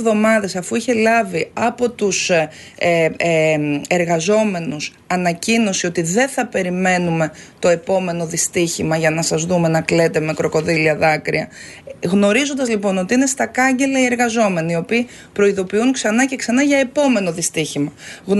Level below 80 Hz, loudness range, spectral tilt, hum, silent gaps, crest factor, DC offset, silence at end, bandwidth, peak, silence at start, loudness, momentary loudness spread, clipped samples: -54 dBFS; 1 LU; -4.5 dB/octave; none; none; 16 dB; under 0.1%; 0 s; 12 kHz; -2 dBFS; 0 s; -17 LUFS; 6 LU; under 0.1%